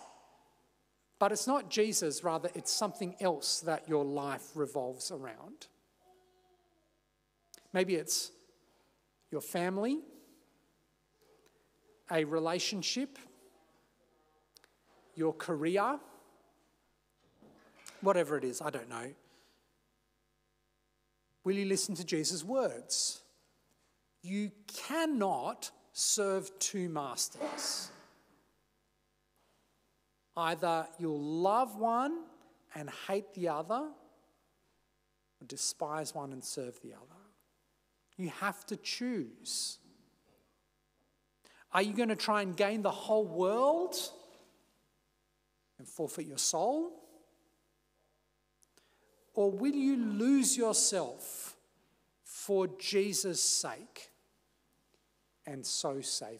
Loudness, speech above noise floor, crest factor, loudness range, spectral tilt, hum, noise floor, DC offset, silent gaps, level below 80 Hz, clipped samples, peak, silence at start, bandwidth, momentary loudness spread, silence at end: -34 LUFS; 44 dB; 22 dB; 9 LU; -3 dB/octave; 50 Hz at -80 dBFS; -78 dBFS; under 0.1%; none; -82 dBFS; under 0.1%; -14 dBFS; 0 s; 16 kHz; 14 LU; 0 s